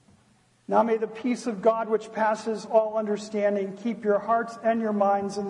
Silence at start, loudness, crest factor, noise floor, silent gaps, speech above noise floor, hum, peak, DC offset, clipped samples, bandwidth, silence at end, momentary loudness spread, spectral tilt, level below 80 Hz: 0.7 s; -26 LUFS; 18 dB; -62 dBFS; none; 37 dB; none; -8 dBFS; under 0.1%; under 0.1%; 11 kHz; 0 s; 6 LU; -6 dB/octave; -74 dBFS